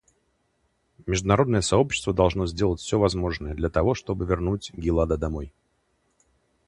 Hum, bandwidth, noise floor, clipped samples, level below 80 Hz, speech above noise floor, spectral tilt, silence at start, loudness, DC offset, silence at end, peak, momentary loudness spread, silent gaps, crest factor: none; 11 kHz; -70 dBFS; under 0.1%; -38 dBFS; 47 dB; -5.5 dB/octave; 1.05 s; -24 LUFS; under 0.1%; 1.2 s; -2 dBFS; 8 LU; none; 22 dB